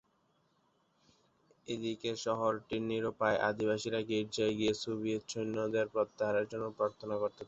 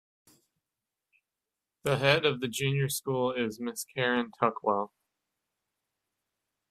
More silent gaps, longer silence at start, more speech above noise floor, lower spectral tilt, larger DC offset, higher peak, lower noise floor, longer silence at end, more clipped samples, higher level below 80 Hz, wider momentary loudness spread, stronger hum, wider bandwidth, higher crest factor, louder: neither; second, 1.7 s vs 1.85 s; second, 40 dB vs 60 dB; about the same, -4 dB/octave vs -4.5 dB/octave; neither; second, -16 dBFS vs -6 dBFS; second, -74 dBFS vs -89 dBFS; second, 0 s vs 1.85 s; neither; about the same, -70 dBFS vs -68 dBFS; second, 5 LU vs 10 LU; neither; second, 8 kHz vs 15.5 kHz; second, 20 dB vs 26 dB; second, -35 LUFS vs -29 LUFS